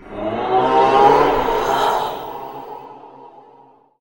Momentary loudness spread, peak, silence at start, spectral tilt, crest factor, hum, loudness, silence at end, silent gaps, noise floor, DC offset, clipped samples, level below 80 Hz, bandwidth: 20 LU; 0 dBFS; 0.05 s; -5 dB/octave; 18 dB; none; -16 LUFS; 0.75 s; none; -49 dBFS; under 0.1%; under 0.1%; -42 dBFS; 16.5 kHz